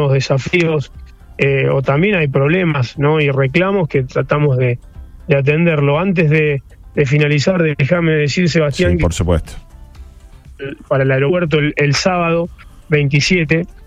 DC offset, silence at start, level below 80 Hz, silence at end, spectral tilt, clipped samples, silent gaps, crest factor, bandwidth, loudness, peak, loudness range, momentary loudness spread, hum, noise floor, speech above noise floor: under 0.1%; 0 s; -34 dBFS; 0 s; -6.5 dB/octave; under 0.1%; none; 14 dB; 9.8 kHz; -14 LUFS; -2 dBFS; 3 LU; 6 LU; none; -38 dBFS; 24 dB